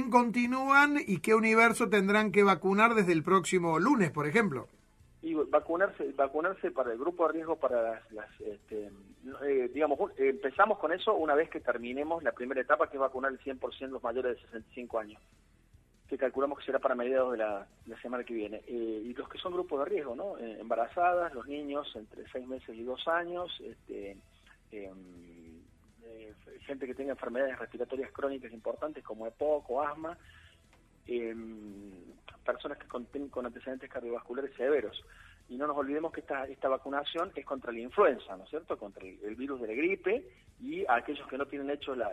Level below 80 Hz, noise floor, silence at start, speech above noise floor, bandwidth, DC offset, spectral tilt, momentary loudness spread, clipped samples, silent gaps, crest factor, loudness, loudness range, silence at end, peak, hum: -64 dBFS; -63 dBFS; 0 s; 31 dB; 14.5 kHz; under 0.1%; -5.5 dB/octave; 18 LU; under 0.1%; none; 22 dB; -32 LUFS; 13 LU; 0 s; -10 dBFS; none